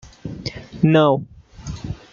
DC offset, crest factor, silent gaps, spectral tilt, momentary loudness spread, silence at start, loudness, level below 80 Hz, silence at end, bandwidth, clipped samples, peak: under 0.1%; 18 dB; none; -7.5 dB/octave; 21 LU; 0.25 s; -18 LUFS; -44 dBFS; 0.15 s; 7.4 kHz; under 0.1%; -2 dBFS